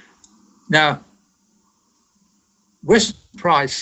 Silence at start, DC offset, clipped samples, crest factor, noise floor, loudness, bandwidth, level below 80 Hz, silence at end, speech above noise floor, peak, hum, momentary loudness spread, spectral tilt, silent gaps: 0.7 s; under 0.1%; under 0.1%; 22 dB; -63 dBFS; -18 LUFS; 9.2 kHz; -52 dBFS; 0 s; 46 dB; 0 dBFS; none; 12 LU; -3.5 dB/octave; none